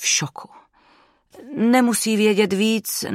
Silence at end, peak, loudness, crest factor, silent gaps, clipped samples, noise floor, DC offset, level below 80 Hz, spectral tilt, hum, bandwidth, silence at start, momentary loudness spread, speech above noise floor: 0 s; -6 dBFS; -19 LUFS; 16 dB; none; under 0.1%; -57 dBFS; under 0.1%; -70 dBFS; -3.5 dB/octave; none; 16 kHz; 0 s; 15 LU; 38 dB